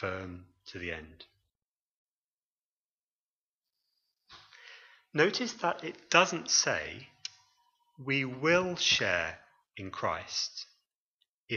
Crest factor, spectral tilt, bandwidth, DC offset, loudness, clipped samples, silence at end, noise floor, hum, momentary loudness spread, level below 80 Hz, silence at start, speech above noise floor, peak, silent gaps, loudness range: 28 dB; -2.5 dB/octave; 7.4 kHz; under 0.1%; -30 LUFS; under 0.1%; 0 s; under -90 dBFS; none; 20 LU; -66 dBFS; 0 s; over 59 dB; -8 dBFS; 1.65-3.61 s, 10.95-11.19 s, 11.29-11.46 s; 17 LU